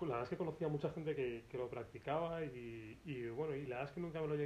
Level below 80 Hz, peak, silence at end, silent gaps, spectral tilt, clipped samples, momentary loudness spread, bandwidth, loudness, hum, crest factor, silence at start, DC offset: -68 dBFS; -28 dBFS; 0 s; none; -8 dB/octave; under 0.1%; 7 LU; 13 kHz; -44 LUFS; none; 16 dB; 0 s; under 0.1%